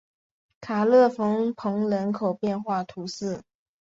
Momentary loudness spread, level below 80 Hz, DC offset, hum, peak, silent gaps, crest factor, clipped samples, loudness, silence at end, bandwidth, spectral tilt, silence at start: 14 LU; -68 dBFS; under 0.1%; none; -10 dBFS; none; 16 dB; under 0.1%; -25 LUFS; 0.4 s; 7.8 kHz; -6.5 dB/octave; 0.6 s